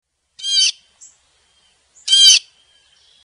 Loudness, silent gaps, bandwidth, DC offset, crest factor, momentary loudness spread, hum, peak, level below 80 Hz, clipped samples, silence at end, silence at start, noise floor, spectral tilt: -11 LUFS; none; 11 kHz; under 0.1%; 18 dB; 17 LU; none; 0 dBFS; -70 dBFS; under 0.1%; 0.85 s; 0.4 s; -58 dBFS; 7 dB/octave